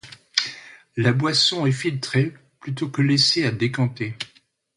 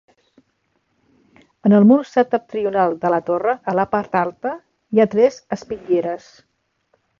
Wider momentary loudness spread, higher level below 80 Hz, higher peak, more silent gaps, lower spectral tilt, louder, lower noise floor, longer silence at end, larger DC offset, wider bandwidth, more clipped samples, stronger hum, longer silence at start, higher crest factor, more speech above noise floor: about the same, 16 LU vs 15 LU; about the same, -60 dBFS vs -60 dBFS; about the same, 0 dBFS vs -2 dBFS; neither; second, -4.5 dB/octave vs -8 dB/octave; second, -21 LUFS vs -18 LUFS; second, -58 dBFS vs -68 dBFS; second, 0.5 s vs 1.05 s; neither; first, 11.5 kHz vs 7.2 kHz; neither; neither; second, 0.05 s vs 1.65 s; first, 22 dB vs 16 dB; second, 37 dB vs 50 dB